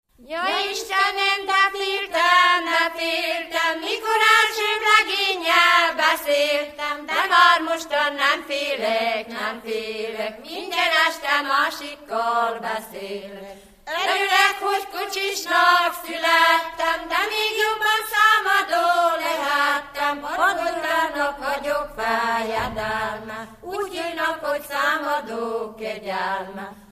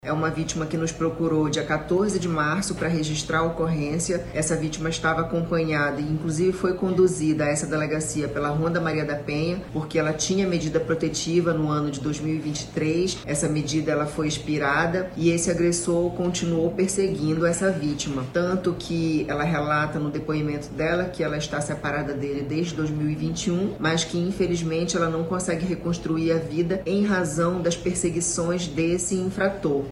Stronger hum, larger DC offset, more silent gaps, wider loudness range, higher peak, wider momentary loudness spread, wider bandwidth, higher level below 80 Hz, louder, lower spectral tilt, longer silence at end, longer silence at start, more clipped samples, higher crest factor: neither; neither; neither; first, 7 LU vs 2 LU; first, -2 dBFS vs -8 dBFS; first, 13 LU vs 5 LU; first, 15 kHz vs 12.5 kHz; second, -56 dBFS vs -46 dBFS; first, -20 LUFS vs -24 LUFS; second, -1 dB/octave vs -5 dB/octave; about the same, 0.1 s vs 0 s; first, 0.25 s vs 0.05 s; neither; about the same, 20 dB vs 16 dB